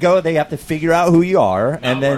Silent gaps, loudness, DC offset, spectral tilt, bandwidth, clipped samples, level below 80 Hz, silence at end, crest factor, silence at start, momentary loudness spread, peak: none; -15 LUFS; under 0.1%; -6.5 dB/octave; 14 kHz; under 0.1%; -46 dBFS; 0 s; 12 dB; 0 s; 7 LU; -2 dBFS